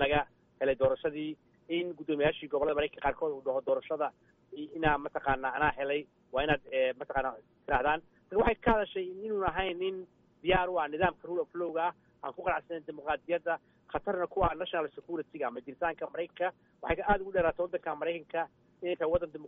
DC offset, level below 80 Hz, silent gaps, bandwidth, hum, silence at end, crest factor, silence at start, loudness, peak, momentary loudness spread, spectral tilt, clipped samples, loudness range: under 0.1%; -50 dBFS; none; 3.9 kHz; none; 0 s; 20 dB; 0 s; -33 LUFS; -12 dBFS; 9 LU; -3 dB/octave; under 0.1%; 3 LU